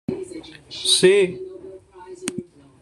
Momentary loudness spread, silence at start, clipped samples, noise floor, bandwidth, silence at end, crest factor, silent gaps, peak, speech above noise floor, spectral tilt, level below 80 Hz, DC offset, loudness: 23 LU; 0.1 s; under 0.1%; -41 dBFS; 13 kHz; 0.4 s; 20 dB; none; -4 dBFS; 23 dB; -3 dB/octave; -60 dBFS; under 0.1%; -19 LUFS